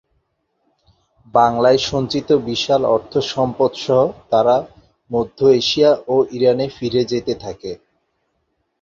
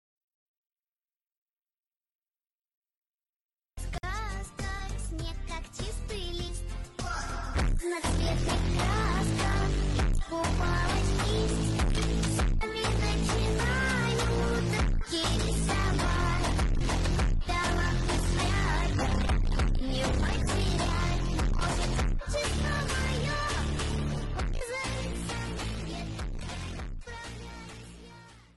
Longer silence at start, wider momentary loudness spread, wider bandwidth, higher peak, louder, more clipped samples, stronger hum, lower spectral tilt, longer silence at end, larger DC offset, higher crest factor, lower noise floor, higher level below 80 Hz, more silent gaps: second, 1.35 s vs 3.75 s; about the same, 11 LU vs 10 LU; second, 7.4 kHz vs 12 kHz; first, -2 dBFS vs -18 dBFS; first, -17 LUFS vs -30 LUFS; neither; neither; about the same, -5.5 dB/octave vs -5 dB/octave; first, 1.05 s vs 0.15 s; neither; about the same, 16 dB vs 12 dB; second, -69 dBFS vs under -90 dBFS; second, -52 dBFS vs -32 dBFS; neither